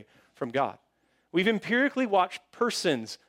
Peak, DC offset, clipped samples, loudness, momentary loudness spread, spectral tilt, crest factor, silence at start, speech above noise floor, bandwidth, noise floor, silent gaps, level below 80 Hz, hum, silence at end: -12 dBFS; under 0.1%; under 0.1%; -27 LUFS; 7 LU; -4 dB/octave; 16 dB; 0.4 s; 34 dB; 16 kHz; -62 dBFS; none; -76 dBFS; none; 0.15 s